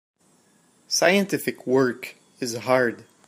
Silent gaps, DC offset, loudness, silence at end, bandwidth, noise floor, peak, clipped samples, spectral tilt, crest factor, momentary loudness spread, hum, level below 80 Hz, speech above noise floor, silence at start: none; under 0.1%; -23 LUFS; 0.25 s; 15.5 kHz; -61 dBFS; -4 dBFS; under 0.1%; -3.5 dB/octave; 22 dB; 13 LU; none; -72 dBFS; 38 dB; 0.9 s